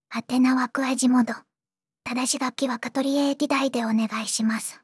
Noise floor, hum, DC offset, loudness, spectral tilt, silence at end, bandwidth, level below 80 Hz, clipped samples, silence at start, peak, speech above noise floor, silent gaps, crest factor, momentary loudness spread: under -90 dBFS; none; under 0.1%; -24 LUFS; -3 dB/octave; 0.1 s; 12 kHz; -76 dBFS; under 0.1%; 0.1 s; -10 dBFS; over 66 dB; none; 14 dB; 7 LU